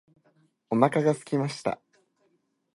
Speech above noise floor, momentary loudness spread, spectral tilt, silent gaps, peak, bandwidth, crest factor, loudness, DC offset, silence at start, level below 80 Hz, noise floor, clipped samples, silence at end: 46 dB; 10 LU; -6.5 dB/octave; none; -4 dBFS; 11.5 kHz; 24 dB; -26 LUFS; under 0.1%; 0.7 s; -72 dBFS; -71 dBFS; under 0.1%; 1 s